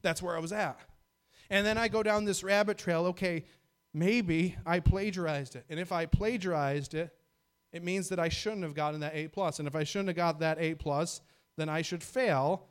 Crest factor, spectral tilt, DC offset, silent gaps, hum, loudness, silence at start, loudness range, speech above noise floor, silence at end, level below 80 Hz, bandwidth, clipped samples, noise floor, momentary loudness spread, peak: 20 dB; -5 dB/octave; under 0.1%; none; none; -32 LUFS; 0.05 s; 4 LU; 44 dB; 0.05 s; -48 dBFS; 16.5 kHz; under 0.1%; -76 dBFS; 10 LU; -12 dBFS